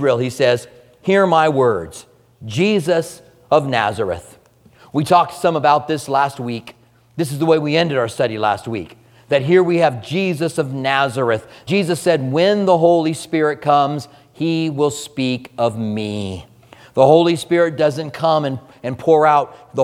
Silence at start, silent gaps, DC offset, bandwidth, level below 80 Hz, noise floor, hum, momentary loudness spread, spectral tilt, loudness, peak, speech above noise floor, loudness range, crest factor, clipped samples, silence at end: 0 s; none; under 0.1%; 15.5 kHz; -56 dBFS; -49 dBFS; none; 13 LU; -6 dB/octave; -17 LUFS; 0 dBFS; 33 dB; 3 LU; 16 dB; under 0.1%; 0 s